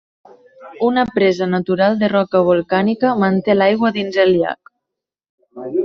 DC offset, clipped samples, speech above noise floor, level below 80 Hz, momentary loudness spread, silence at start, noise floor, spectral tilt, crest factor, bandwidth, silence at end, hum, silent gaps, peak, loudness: under 0.1%; under 0.1%; 66 dB; -56 dBFS; 6 LU; 0.6 s; -81 dBFS; -5 dB/octave; 16 dB; 6.8 kHz; 0 s; none; 5.29-5.38 s; -2 dBFS; -16 LUFS